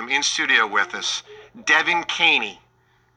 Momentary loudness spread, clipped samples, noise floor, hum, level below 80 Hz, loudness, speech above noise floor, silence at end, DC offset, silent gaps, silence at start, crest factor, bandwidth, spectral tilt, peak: 11 LU; under 0.1%; -61 dBFS; none; -68 dBFS; -19 LUFS; 40 dB; 0.65 s; under 0.1%; none; 0 s; 20 dB; 10 kHz; 0 dB/octave; -2 dBFS